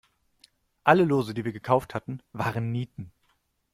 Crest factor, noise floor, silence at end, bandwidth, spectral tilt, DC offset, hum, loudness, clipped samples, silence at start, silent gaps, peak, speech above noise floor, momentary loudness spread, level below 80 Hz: 24 dB; -71 dBFS; 0.65 s; 15.5 kHz; -7.5 dB/octave; under 0.1%; none; -26 LUFS; under 0.1%; 0.85 s; none; -4 dBFS; 45 dB; 17 LU; -60 dBFS